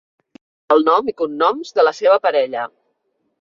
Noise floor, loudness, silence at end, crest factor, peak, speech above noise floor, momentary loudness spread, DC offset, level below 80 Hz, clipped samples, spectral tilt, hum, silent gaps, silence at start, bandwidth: -69 dBFS; -17 LUFS; 0.75 s; 16 dB; -2 dBFS; 53 dB; 9 LU; under 0.1%; -68 dBFS; under 0.1%; -4 dB/octave; none; none; 0.7 s; 7.4 kHz